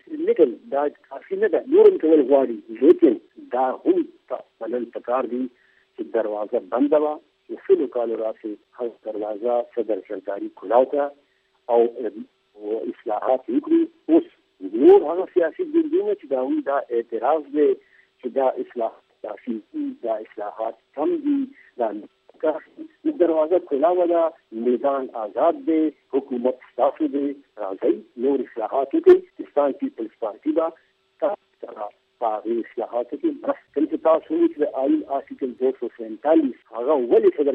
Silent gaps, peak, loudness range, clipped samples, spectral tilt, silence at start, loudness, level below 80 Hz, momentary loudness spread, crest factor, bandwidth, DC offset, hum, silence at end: none; -4 dBFS; 8 LU; under 0.1%; -8.5 dB/octave; 0.1 s; -22 LUFS; -76 dBFS; 14 LU; 18 dB; 4 kHz; under 0.1%; none; 0 s